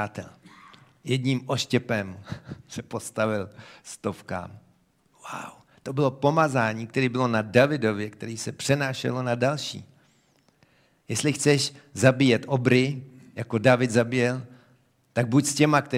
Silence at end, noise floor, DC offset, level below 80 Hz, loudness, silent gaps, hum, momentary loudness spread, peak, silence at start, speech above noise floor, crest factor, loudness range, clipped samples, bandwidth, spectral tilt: 0 s; -64 dBFS; under 0.1%; -64 dBFS; -25 LUFS; none; none; 19 LU; -2 dBFS; 0 s; 39 dB; 24 dB; 9 LU; under 0.1%; 15.5 kHz; -5 dB/octave